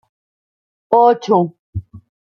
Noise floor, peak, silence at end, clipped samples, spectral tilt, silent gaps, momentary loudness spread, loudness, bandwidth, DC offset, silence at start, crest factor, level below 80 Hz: under -90 dBFS; -2 dBFS; 0.3 s; under 0.1%; -7.5 dB/octave; 1.59-1.73 s; 18 LU; -15 LUFS; 6.8 kHz; under 0.1%; 0.9 s; 16 dB; -50 dBFS